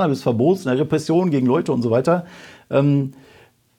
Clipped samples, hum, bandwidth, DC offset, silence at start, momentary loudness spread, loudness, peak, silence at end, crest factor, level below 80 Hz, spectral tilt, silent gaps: under 0.1%; none; 13.5 kHz; under 0.1%; 0 s; 5 LU; -19 LUFS; -6 dBFS; 0.65 s; 14 dB; -62 dBFS; -8 dB/octave; none